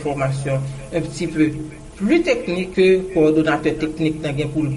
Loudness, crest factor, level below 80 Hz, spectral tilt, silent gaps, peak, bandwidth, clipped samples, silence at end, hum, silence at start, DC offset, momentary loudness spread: -19 LUFS; 14 dB; -42 dBFS; -6.5 dB/octave; none; -6 dBFS; 11.5 kHz; under 0.1%; 0 s; none; 0 s; under 0.1%; 10 LU